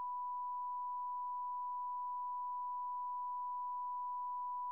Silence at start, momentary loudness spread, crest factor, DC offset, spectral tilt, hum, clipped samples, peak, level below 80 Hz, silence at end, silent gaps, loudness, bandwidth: 0 s; 0 LU; 4 dB; under 0.1%; -2.5 dB/octave; none; under 0.1%; -38 dBFS; under -90 dBFS; 0 s; none; -42 LUFS; 1.1 kHz